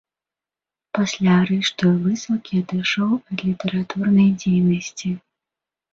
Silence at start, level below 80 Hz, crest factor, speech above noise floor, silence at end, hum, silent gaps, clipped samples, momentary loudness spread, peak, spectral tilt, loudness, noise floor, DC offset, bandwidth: 0.95 s; -58 dBFS; 16 dB; 70 dB; 0.75 s; none; none; under 0.1%; 10 LU; -6 dBFS; -6 dB/octave; -20 LUFS; -89 dBFS; under 0.1%; 7.8 kHz